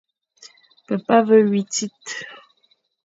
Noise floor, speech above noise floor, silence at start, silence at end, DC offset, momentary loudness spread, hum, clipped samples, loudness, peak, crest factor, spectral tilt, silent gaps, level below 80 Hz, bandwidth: -64 dBFS; 46 dB; 0.45 s; 0.7 s; under 0.1%; 17 LU; none; under 0.1%; -19 LUFS; -2 dBFS; 20 dB; -4.5 dB/octave; none; -72 dBFS; 7.8 kHz